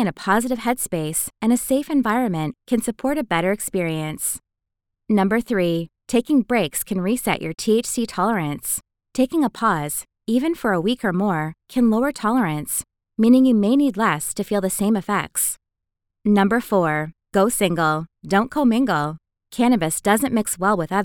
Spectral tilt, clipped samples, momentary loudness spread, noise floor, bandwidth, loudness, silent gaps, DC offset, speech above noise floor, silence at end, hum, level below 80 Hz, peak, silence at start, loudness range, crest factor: -5 dB/octave; under 0.1%; 7 LU; -81 dBFS; 19.5 kHz; -21 LUFS; none; under 0.1%; 61 dB; 0 s; none; -52 dBFS; -4 dBFS; 0 s; 3 LU; 18 dB